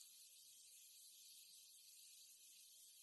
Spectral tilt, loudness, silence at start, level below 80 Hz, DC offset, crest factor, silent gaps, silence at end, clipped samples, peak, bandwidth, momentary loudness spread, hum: 4 dB/octave; -62 LUFS; 0 s; under -90 dBFS; under 0.1%; 22 dB; none; 0 s; under 0.1%; -44 dBFS; 12 kHz; 2 LU; none